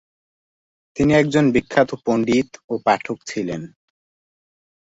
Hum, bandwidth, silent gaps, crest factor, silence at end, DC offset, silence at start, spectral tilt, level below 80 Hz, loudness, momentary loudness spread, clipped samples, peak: none; 8 kHz; 2.64-2.68 s; 20 dB; 1.2 s; under 0.1%; 0.95 s; -6 dB/octave; -50 dBFS; -19 LUFS; 12 LU; under 0.1%; -2 dBFS